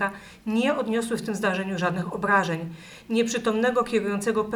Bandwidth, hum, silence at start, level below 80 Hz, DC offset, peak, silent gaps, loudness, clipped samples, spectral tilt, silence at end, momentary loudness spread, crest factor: 18.5 kHz; none; 0 s; -58 dBFS; under 0.1%; -8 dBFS; none; -25 LUFS; under 0.1%; -5 dB/octave; 0 s; 7 LU; 18 dB